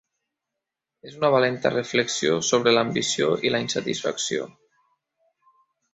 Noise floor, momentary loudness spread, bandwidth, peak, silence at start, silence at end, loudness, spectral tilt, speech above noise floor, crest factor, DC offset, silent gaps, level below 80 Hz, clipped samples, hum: -85 dBFS; 7 LU; 8.2 kHz; -4 dBFS; 1.05 s; 1.45 s; -23 LUFS; -3.5 dB/octave; 62 dB; 20 dB; under 0.1%; none; -66 dBFS; under 0.1%; none